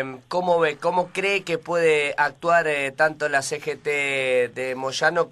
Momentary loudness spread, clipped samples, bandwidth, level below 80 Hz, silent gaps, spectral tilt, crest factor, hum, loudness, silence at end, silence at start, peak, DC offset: 6 LU; under 0.1%; 13 kHz; -66 dBFS; none; -3.5 dB/octave; 16 dB; none; -22 LUFS; 0 s; 0 s; -6 dBFS; under 0.1%